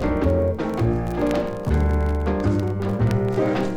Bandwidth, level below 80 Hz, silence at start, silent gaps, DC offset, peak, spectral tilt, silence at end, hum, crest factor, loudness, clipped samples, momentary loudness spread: 12 kHz; -28 dBFS; 0 s; none; under 0.1%; -8 dBFS; -8.5 dB/octave; 0 s; none; 12 dB; -22 LUFS; under 0.1%; 3 LU